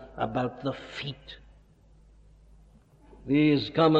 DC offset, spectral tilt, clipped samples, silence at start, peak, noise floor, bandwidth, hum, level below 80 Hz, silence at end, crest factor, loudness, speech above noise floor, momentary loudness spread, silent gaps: under 0.1%; -8 dB/octave; under 0.1%; 0 s; -10 dBFS; -57 dBFS; 7.6 kHz; none; -56 dBFS; 0 s; 20 dB; -28 LUFS; 31 dB; 24 LU; none